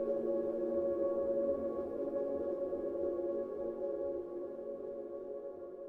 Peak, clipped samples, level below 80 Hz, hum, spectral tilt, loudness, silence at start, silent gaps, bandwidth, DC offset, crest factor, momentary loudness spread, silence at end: -24 dBFS; under 0.1%; -68 dBFS; none; -9.5 dB/octave; -38 LUFS; 0 s; none; 3 kHz; under 0.1%; 14 dB; 9 LU; 0 s